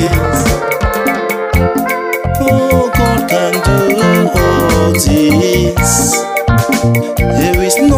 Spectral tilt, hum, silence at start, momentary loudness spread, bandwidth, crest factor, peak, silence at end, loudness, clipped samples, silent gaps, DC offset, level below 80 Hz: -5 dB/octave; none; 0 s; 4 LU; 16 kHz; 10 dB; 0 dBFS; 0 s; -11 LUFS; under 0.1%; none; under 0.1%; -22 dBFS